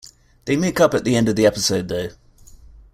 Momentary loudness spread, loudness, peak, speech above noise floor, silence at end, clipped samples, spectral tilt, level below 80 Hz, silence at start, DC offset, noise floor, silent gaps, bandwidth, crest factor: 11 LU; -19 LUFS; -2 dBFS; 27 dB; 0.85 s; under 0.1%; -4.5 dB/octave; -46 dBFS; 0.45 s; under 0.1%; -45 dBFS; none; 16 kHz; 18 dB